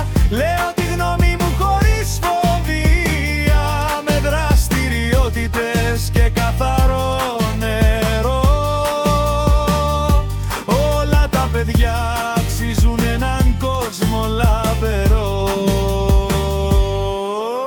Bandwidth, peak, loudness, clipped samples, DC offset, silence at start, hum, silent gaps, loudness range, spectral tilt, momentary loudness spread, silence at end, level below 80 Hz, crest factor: 18 kHz; -2 dBFS; -17 LUFS; under 0.1%; under 0.1%; 0 s; none; none; 1 LU; -5.5 dB/octave; 3 LU; 0 s; -20 dBFS; 12 dB